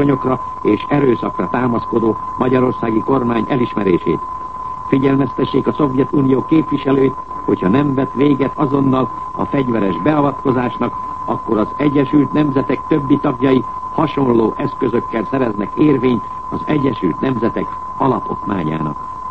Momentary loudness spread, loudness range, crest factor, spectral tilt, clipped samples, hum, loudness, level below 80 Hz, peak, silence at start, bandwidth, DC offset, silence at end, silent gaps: 7 LU; 2 LU; 16 dB; -9.5 dB/octave; under 0.1%; none; -16 LUFS; -44 dBFS; 0 dBFS; 0 s; 6 kHz; 1%; 0 s; none